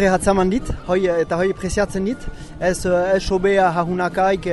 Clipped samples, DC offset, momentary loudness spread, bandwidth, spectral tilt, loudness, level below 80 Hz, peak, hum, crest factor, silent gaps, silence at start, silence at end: under 0.1%; under 0.1%; 8 LU; 11.5 kHz; -5.5 dB/octave; -19 LUFS; -34 dBFS; -4 dBFS; none; 14 dB; none; 0 s; 0 s